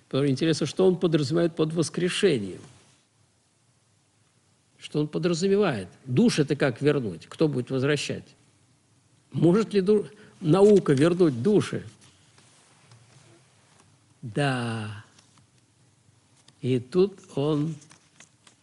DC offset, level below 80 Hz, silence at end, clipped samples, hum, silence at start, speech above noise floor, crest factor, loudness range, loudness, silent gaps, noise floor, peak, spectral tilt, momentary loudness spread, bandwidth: under 0.1%; -64 dBFS; 0.85 s; under 0.1%; none; 0.15 s; 42 dB; 18 dB; 12 LU; -24 LUFS; none; -66 dBFS; -8 dBFS; -6.5 dB/octave; 14 LU; 11.5 kHz